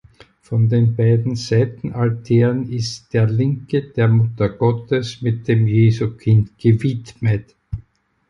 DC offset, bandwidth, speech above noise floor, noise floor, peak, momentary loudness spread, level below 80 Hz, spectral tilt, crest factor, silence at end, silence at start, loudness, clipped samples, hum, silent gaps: under 0.1%; 7.4 kHz; 33 dB; -50 dBFS; -4 dBFS; 8 LU; -44 dBFS; -8 dB/octave; 14 dB; 0.5 s; 0.5 s; -18 LUFS; under 0.1%; none; none